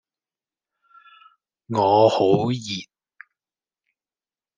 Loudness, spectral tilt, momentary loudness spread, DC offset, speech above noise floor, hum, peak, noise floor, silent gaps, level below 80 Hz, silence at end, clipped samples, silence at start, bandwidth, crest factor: -20 LUFS; -6.5 dB/octave; 14 LU; under 0.1%; over 71 dB; none; -4 dBFS; under -90 dBFS; none; -66 dBFS; 1.75 s; under 0.1%; 1.7 s; 9.6 kHz; 20 dB